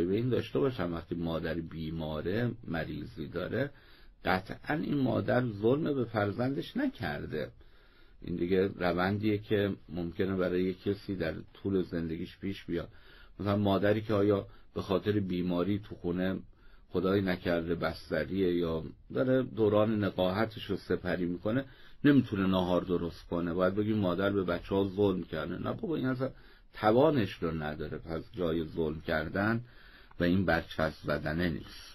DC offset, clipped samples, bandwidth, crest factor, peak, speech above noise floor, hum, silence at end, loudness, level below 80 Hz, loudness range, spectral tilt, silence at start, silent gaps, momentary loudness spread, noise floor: under 0.1%; under 0.1%; 15 kHz; 18 dB; -12 dBFS; 25 dB; none; 0 s; -32 LUFS; -56 dBFS; 4 LU; -8.5 dB/octave; 0 s; none; 10 LU; -57 dBFS